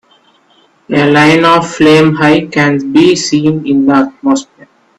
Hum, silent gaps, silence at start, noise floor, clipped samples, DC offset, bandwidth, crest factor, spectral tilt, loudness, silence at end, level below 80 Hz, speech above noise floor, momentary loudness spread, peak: none; none; 0.9 s; -49 dBFS; under 0.1%; under 0.1%; 11.5 kHz; 10 dB; -5.5 dB/octave; -9 LUFS; 0.55 s; -48 dBFS; 41 dB; 6 LU; 0 dBFS